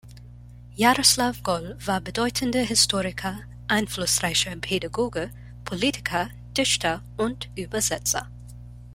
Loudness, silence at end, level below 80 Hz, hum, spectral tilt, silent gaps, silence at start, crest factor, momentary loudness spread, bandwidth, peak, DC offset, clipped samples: -24 LUFS; 0 s; -46 dBFS; 60 Hz at -40 dBFS; -2.5 dB/octave; none; 0.05 s; 22 dB; 15 LU; 16.5 kHz; -4 dBFS; under 0.1%; under 0.1%